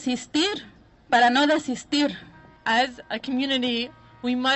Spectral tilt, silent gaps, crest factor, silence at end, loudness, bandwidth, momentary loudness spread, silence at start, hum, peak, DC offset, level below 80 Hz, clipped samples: -3 dB/octave; none; 18 dB; 0 s; -23 LUFS; 8.2 kHz; 14 LU; 0 s; none; -6 dBFS; under 0.1%; -60 dBFS; under 0.1%